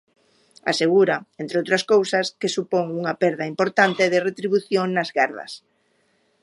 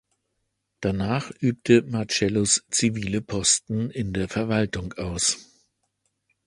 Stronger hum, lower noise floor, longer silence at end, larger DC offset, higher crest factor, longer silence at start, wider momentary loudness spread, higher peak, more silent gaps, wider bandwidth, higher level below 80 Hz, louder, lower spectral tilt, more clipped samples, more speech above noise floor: neither; second, -65 dBFS vs -77 dBFS; second, 0.85 s vs 1.05 s; neither; about the same, 20 dB vs 22 dB; second, 0.65 s vs 0.8 s; about the same, 9 LU vs 9 LU; about the same, -2 dBFS vs -4 dBFS; neither; about the same, 11.5 kHz vs 11.5 kHz; second, -72 dBFS vs -48 dBFS; first, -21 LUFS vs -24 LUFS; about the same, -4.5 dB/octave vs -4 dB/octave; neither; second, 44 dB vs 53 dB